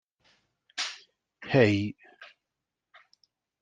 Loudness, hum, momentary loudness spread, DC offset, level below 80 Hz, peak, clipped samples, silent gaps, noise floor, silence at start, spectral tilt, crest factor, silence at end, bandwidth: -27 LUFS; none; 25 LU; under 0.1%; -68 dBFS; -8 dBFS; under 0.1%; none; -87 dBFS; 0.75 s; -5.5 dB/octave; 24 dB; 1.35 s; 9.8 kHz